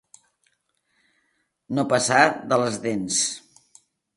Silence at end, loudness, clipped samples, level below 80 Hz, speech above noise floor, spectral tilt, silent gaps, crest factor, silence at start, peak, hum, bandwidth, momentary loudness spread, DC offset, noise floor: 0.75 s; -22 LUFS; under 0.1%; -66 dBFS; 50 dB; -3 dB/octave; none; 24 dB; 1.7 s; -2 dBFS; none; 11.5 kHz; 10 LU; under 0.1%; -72 dBFS